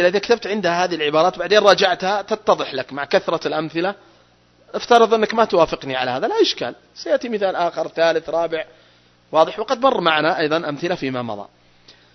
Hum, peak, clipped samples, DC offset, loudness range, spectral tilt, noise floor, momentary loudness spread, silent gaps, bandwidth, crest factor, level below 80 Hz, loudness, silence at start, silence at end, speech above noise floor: 60 Hz at -60 dBFS; 0 dBFS; under 0.1%; under 0.1%; 3 LU; -4 dB/octave; -55 dBFS; 12 LU; none; 7.4 kHz; 20 dB; -58 dBFS; -19 LUFS; 0 s; 0.7 s; 36 dB